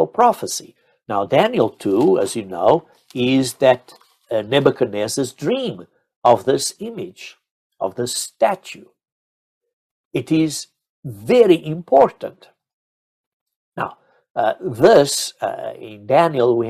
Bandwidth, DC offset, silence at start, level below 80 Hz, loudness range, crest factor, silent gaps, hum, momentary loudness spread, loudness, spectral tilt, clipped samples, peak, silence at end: 15 kHz; under 0.1%; 0 s; -60 dBFS; 6 LU; 18 dB; 6.16-6.22 s, 7.51-7.70 s, 9.12-9.61 s, 9.73-10.11 s, 10.89-11.03 s, 12.73-13.46 s, 13.56-13.72 s, 14.30-14.35 s; none; 18 LU; -18 LUFS; -4.5 dB/octave; under 0.1%; 0 dBFS; 0 s